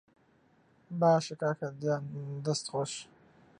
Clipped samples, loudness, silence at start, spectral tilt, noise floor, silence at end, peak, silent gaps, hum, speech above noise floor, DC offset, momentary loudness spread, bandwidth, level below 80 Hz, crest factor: under 0.1%; -32 LUFS; 0.9 s; -5.5 dB/octave; -67 dBFS; 0.55 s; -14 dBFS; none; none; 35 dB; under 0.1%; 15 LU; 11 kHz; -76 dBFS; 20 dB